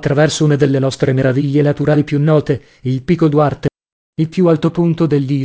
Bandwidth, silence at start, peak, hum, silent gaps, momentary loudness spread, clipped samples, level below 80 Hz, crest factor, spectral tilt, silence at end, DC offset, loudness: 8 kHz; 0 s; 0 dBFS; none; 3.92-4.13 s; 8 LU; under 0.1%; -44 dBFS; 14 dB; -7 dB/octave; 0 s; 0.1%; -14 LUFS